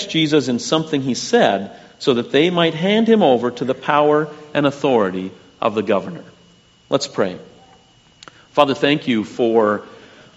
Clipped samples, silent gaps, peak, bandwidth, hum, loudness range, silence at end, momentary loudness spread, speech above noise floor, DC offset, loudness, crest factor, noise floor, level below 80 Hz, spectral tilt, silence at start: under 0.1%; none; 0 dBFS; 8 kHz; none; 6 LU; 0.4 s; 9 LU; 34 dB; under 0.1%; -18 LUFS; 18 dB; -51 dBFS; -62 dBFS; -4 dB/octave; 0 s